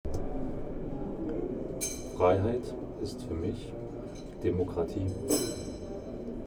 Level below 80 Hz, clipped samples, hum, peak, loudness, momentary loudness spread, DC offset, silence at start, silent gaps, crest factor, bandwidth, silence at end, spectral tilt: -44 dBFS; under 0.1%; none; -12 dBFS; -34 LUFS; 12 LU; under 0.1%; 0.05 s; none; 20 dB; over 20 kHz; 0 s; -5.5 dB/octave